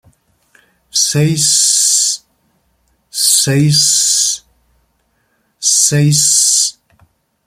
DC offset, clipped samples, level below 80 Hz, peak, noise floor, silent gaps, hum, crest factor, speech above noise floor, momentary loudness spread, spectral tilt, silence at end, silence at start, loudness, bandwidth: under 0.1%; under 0.1%; -54 dBFS; 0 dBFS; -61 dBFS; none; none; 14 dB; 50 dB; 8 LU; -2.5 dB/octave; 0.75 s; 0.95 s; -10 LUFS; 16.5 kHz